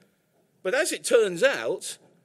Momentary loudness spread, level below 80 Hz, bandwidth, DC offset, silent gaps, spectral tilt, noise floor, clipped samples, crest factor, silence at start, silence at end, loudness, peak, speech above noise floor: 12 LU; -78 dBFS; 16 kHz; under 0.1%; none; -2 dB/octave; -67 dBFS; under 0.1%; 20 dB; 0.65 s; 0.3 s; -25 LUFS; -6 dBFS; 43 dB